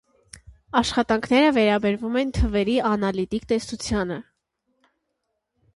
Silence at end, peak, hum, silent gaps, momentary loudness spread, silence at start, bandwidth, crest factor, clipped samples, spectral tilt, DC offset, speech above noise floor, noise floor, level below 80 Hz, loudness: 1.55 s; -4 dBFS; none; none; 8 LU; 0.35 s; 11.5 kHz; 20 dB; under 0.1%; -5.5 dB/octave; under 0.1%; 56 dB; -77 dBFS; -38 dBFS; -22 LUFS